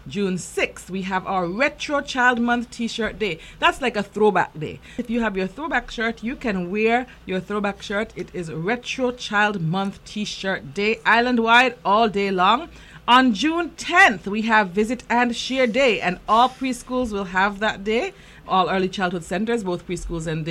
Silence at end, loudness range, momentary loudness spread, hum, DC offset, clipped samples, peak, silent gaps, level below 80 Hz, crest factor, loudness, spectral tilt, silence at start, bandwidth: 0 s; 6 LU; 12 LU; none; under 0.1%; under 0.1%; -2 dBFS; none; -46 dBFS; 20 dB; -21 LUFS; -4.5 dB/octave; 0.05 s; 13.5 kHz